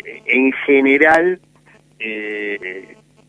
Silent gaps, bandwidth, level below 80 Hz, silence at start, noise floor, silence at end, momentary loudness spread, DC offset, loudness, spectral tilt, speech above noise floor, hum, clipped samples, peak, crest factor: none; 10.5 kHz; -58 dBFS; 0.05 s; -51 dBFS; 0.45 s; 17 LU; under 0.1%; -15 LUFS; -5.5 dB/octave; 35 dB; none; under 0.1%; 0 dBFS; 18 dB